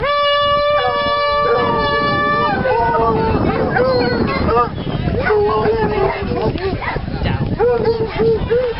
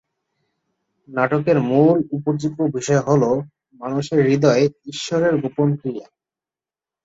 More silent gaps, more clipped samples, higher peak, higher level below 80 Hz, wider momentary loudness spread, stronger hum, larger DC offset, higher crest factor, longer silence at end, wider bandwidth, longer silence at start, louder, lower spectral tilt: neither; neither; about the same, -2 dBFS vs -2 dBFS; first, -32 dBFS vs -60 dBFS; second, 5 LU vs 13 LU; neither; first, 0.8% vs under 0.1%; about the same, 14 dB vs 18 dB; second, 0 s vs 1.05 s; second, 5.8 kHz vs 8 kHz; second, 0 s vs 1.1 s; first, -16 LUFS vs -19 LUFS; first, -9 dB/octave vs -6.5 dB/octave